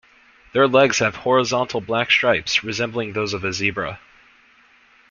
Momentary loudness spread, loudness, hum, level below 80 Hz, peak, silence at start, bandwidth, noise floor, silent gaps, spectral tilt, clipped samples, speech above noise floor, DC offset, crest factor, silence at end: 9 LU; -19 LUFS; none; -56 dBFS; -2 dBFS; 0.55 s; 7.4 kHz; -54 dBFS; none; -3.5 dB/octave; under 0.1%; 34 dB; under 0.1%; 20 dB; 1.15 s